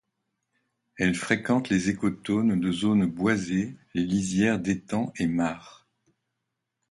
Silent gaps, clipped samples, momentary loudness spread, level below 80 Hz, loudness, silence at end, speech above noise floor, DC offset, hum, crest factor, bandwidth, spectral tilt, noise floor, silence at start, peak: none; under 0.1%; 6 LU; -56 dBFS; -26 LUFS; 1.2 s; 57 dB; under 0.1%; none; 18 dB; 11.5 kHz; -5.5 dB/octave; -82 dBFS; 1 s; -8 dBFS